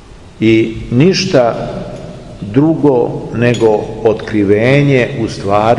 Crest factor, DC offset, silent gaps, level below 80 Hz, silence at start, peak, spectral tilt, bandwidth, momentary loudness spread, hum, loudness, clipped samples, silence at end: 12 dB; 0.3%; none; -38 dBFS; 0.1 s; 0 dBFS; -6.5 dB/octave; 11 kHz; 13 LU; none; -12 LUFS; under 0.1%; 0 s